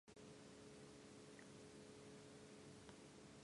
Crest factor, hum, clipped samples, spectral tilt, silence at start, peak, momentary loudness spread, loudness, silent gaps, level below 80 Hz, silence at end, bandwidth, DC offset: 16 dB; none; under 0.1%; -4.5 dB/octave; 0.05 s; -46 dBFS; 1 LU; -61 LUFS; none; -82 dBFS; 0 s; 11.5 kHz; under 0.1%